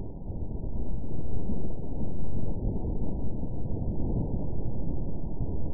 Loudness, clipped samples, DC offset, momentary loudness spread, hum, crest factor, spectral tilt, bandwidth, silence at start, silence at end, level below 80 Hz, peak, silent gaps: -35 LUFS; under 0.1%; under 0.1%; 5 LU; none; 8 dB; -16 dB/octave; 1.1 kHz; 0 s; 0 s; -34 dBFS; -14 dBFS; none